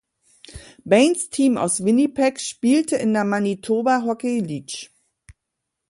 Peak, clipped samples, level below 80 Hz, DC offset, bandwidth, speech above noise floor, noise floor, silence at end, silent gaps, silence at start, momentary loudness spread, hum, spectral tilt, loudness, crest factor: -2 dBFS; under 0.1%; -58 dBFS; under 0.1%; 11.5 kHz; 61 dB; -80 dBFS; 0.6 s; none; 0.5 s; 15 LU; none; -4.5 dB/octave; -20 LUFS; 18 dB